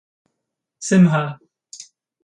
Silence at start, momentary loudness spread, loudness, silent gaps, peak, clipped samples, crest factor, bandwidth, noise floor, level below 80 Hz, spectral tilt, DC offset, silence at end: 0.8 s; 24 LU; -17 LUFS; none; -4 dBFS; under 0.1%; 18 dB; 10 kHz; -79 dBFS; -62 dBFS; -6.5 dB/octave; under 0.1%; 0.4 s